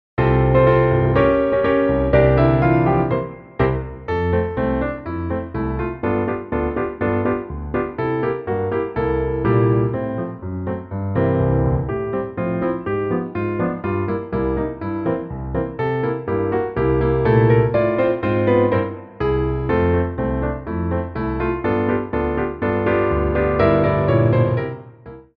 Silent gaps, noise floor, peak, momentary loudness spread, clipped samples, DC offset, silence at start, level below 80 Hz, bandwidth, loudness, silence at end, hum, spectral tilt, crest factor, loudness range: none; -40 dBFS; -2 dBFS; 9 LU; under 0.1%; under 0.1%; 0.2 s; -32 dBFS; 5 kHz; -20 LUFS; 0.15 s; none; -11 dB/octave; 16 dB; 5 LU